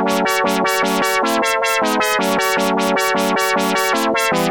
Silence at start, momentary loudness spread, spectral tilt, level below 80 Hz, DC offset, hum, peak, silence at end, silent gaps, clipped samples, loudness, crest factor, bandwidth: 0 s; 0 LU; -3 dB/octave; -54 dBFS; under 0.1%; none; -4 dBFS; 0 s; none; under 0.1%; -16 LUFS; 12 dB; over 20 kHz